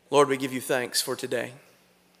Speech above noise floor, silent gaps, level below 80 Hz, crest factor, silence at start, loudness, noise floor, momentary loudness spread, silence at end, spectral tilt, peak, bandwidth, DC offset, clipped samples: 35 dB; none; -80 dBFS; 20 dB; 0.1 s; -26 LUFS; -61 dBFS; 9 LU; 0.6 s; -3 dB/octave; -8 dBFS; 16 kHz; under 0.1%; under 0.1%